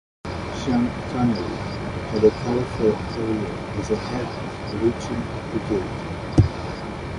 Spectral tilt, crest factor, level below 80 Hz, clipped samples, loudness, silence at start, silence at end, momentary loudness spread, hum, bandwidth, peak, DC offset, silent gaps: -7 dB/octave; 22 dB; -38 dBFS; under 0.1%; -24 LUFS; 0.25 s; 0 s; 10 LU; none; 11.5 kHz; -2 dBFS; under 0.1%; none